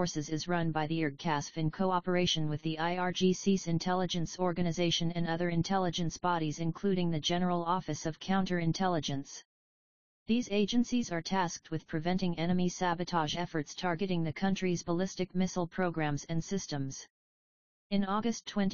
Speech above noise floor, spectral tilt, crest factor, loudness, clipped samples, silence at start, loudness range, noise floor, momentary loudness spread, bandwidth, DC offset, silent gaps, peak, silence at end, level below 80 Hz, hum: over 58 dB; -5 dB/octave; 16 dB; -33 LUFS; under 0.1%; 0 s; 3 LU; under -90 dBFS; 6 LU; 7.2 kHz; 0.5%; 9.45-10.26 s, 17.10-17.90 s; -16 dBFS; 0 s; -58 dBFS; none